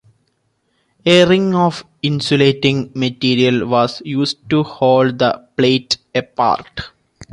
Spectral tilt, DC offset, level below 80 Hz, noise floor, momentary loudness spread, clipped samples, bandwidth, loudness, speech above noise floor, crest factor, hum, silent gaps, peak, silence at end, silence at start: -5.5 dB/octave; under 0.1%; -50 dBFS; -65 dBFS; 9 LU; under 0.1%; 11.5 kHz; -15 LUFS; 50 dB; 14 dB; none; none; -2 dBFS; 0.1 s; 1.05 s